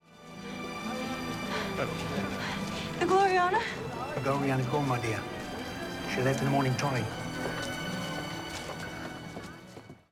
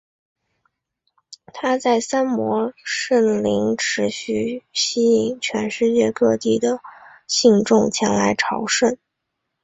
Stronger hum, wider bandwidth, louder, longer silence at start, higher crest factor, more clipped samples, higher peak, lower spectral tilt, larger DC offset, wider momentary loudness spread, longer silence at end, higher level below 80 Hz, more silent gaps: neither; first, 17.5 kHz vs 8.2 kHz; second, -32 LUFS vs -19 LUFS; second, 0.1 s vs 1.3 s; about the same, 18 dB vs 18 dB; neither; second, -14 dBFS vs -2 dBFS; first, -5 dB/octave vs -3.5 dB/octave; neither; first, 14 LU vs 7 LU; second, 0.15 s vs 0.7 s; about the same, -56 dBFS vs -58 dBFS; neither